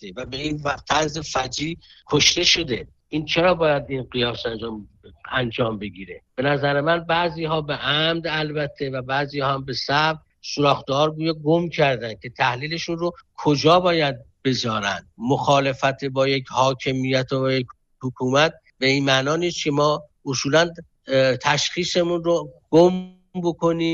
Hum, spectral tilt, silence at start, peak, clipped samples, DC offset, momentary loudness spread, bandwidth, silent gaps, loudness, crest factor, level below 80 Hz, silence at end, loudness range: none; -4.5 dB/octave; 0 s; -4 dBFS; under 0.1%; under 0.1%; 11 LU; 8 kHz; none; -21 LUFS; 18 dB; -52 dBFS; 0 s; 3 LU